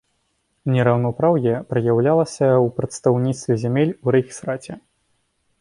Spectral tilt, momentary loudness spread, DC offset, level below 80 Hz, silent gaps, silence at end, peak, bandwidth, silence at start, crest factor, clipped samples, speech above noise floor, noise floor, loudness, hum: -7.5 dB/octave; 11 LU; under 0.1%; -56 dBFS; none; 0.8 s; -4 dBFS; 11 kHz; 0.65 s; 16 dB; under 0.1%; 50 dB; -69 dBFS; -20 LUFS; none